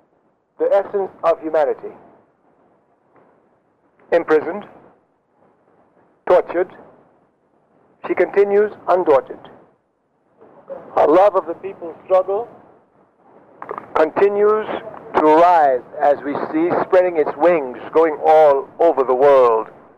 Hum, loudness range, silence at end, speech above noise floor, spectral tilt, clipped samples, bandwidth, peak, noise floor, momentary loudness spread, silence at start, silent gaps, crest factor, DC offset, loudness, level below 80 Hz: none; 9 LU; 0.35 s; 49 dB; -7 dB/octave; under 0.1%; 7.2 kHz; -4 dBFS; -64 dBFS; 19 LU; 0.6 s; none; 14 dB; under 0.1%; -16 LUFS; -60 dBFS